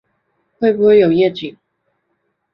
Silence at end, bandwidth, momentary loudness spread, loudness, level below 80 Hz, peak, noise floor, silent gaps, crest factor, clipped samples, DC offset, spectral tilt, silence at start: 1.05 s; 5.6 kHz; 17 LU; -13 LUFS; -58 dBFS; -2 dBFS; -69 dBFS; none; 14 dB; under 0.1%; under 0.1%; -9 dB/octave; 0.6 s